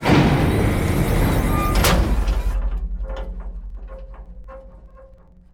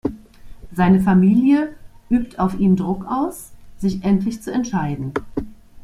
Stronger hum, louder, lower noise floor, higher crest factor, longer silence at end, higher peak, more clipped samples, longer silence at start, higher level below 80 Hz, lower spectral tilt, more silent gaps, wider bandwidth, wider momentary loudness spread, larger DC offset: neither; about the same, -20 LUFS vs -19 LUFS; first, -46 dBFS vs -38 dBFS; about the same, 16 dB vs 14 dB; first, 0.45 s vs 0.05 s; about the same, -4 dBFS vs -4 dBFS; neither; about the same, 0 s vs 0.05 s; first, -24 dBFS vs -42 dBFS; second, -6 dB/octave vs -8 dB/octave; neither; first, 18 kHz vs 13.5 kHz; first, 23 LU vs 15 LU; neither